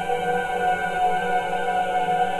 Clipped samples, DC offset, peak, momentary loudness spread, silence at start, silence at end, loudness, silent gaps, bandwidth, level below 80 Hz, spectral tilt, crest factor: under 0.1%; under 0.1%; -10 dBFS; 2 LU; 0 s; 0 s; -23 LUFS; none; 13 kHz; -50 dBFS; -4 dB/octave; 12 dB